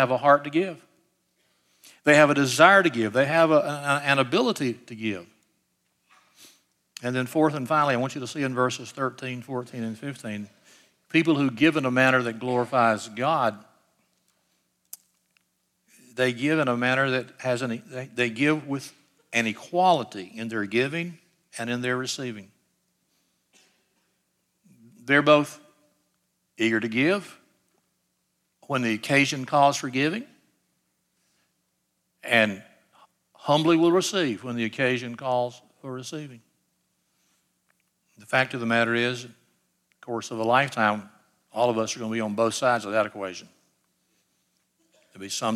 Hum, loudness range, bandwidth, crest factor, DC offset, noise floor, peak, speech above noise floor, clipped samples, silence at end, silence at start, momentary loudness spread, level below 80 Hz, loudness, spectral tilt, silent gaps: none; 10 LU; 15 kHz; 22 dB; under 0.1%; -75 dBFS; -4 dBFS; 51 dB; under 0.1%; 0 s; 0 s; 16 LU; -78 dBFS; -24 LUFS; -4.5 dB/octave; none